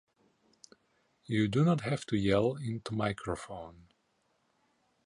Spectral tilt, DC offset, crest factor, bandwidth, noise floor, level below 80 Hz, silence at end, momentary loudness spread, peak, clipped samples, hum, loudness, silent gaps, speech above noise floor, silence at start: -7 dB/octave; under 0.1%; 20 dB; 11.5 kHz; -75 dBFS; -58 dBFS; 1.25 s; 14 LU; -14 dBFS; under 0.1%; none; -32 LUFS; none; 44 dB; 1.3 s